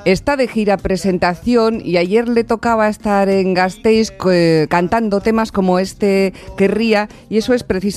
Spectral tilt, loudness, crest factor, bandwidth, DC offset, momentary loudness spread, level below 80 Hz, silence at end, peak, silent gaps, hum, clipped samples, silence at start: -6 dB/octave; -15 LUFS; 12 dB; 14 kHz; under 0.1%; 3 LU; -40 dBFS; 0 s; -2 dBFS; none; none; under 0.1%; 0 s